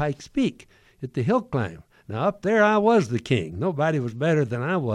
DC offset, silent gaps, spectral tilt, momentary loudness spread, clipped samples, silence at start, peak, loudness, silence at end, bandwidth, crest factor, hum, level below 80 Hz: under 0.1%; none; -7 dB/octave; 10 LU; under 0.1%; 0 s; -8 dBFS; -23 LUFS; 0 s; 11.5 kHz; 16 dB; none; -56 dBFS